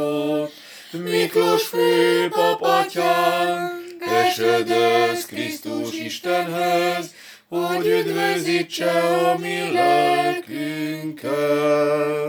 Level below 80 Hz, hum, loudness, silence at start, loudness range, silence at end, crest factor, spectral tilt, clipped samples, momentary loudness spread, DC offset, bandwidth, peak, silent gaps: -76 dBFS; none; -20 LUFS; 0 s; 3 LU; 0 s; 16 dB; -4 dB/octave; under 0.1%; 10 LU; under 0.1%; over 20 kHz; -4 dBFS; none